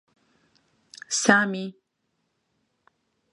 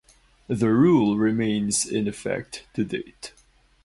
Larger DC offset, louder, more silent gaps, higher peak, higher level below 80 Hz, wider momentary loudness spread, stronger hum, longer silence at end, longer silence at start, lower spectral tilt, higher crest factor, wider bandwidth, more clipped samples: neither; about the same, -22 LUFS vs -23 LUFS; neither; first, 0 dBFS vs -8 dBFS; second, -74 dBFS vs -54 dBFS; first, 20 LU vs 16 LU; neither; first, 1.6 s vs 0.55 s; first, 1.1 s vs 0.5 s; second, -3 dB/octave vs -5 dB/octave; first, 28 dB vs 16 dB; about the same, 11.5 kHz vs 11.5 kHz; neither